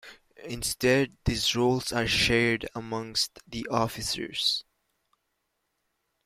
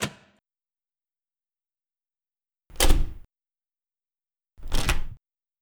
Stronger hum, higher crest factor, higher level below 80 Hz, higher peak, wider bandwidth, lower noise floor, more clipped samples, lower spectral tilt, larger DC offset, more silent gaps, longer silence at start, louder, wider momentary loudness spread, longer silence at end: neither; about the same, 20 dB vs 24 dB; second, -48 dBFS vs -30 dBFS; second, -10 dBFS vs -4 dBFS; second, 16 kHz vs over 20 kHz; second, -79 dBFS vs under -90 dBFS; neither; about the same, -3.5 dB/octave vs -3 dB/octave; neither; neither; about the same, 0.05 s vs 0 s; about the same, -27 LUFS vs -28 LUFS; second, 11 LU vs 19 LU; first, 1.65 s vs 0.45 s